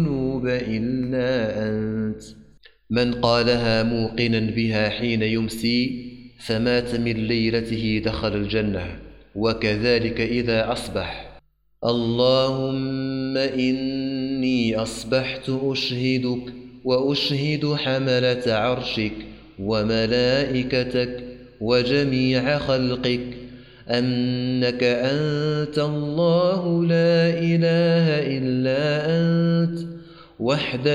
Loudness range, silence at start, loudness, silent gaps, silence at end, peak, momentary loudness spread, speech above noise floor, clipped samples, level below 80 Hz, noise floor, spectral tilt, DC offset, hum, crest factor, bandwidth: 4 LU; 0 s; -22 LUFS; none; 0 s; -4 dBFS; 9 LU; 30 dB; under 0.1%; -46 dBFS; -52 dBFS; -6.5 dB/octave; under 0.1%; none; 18 dB; 13.5 kHz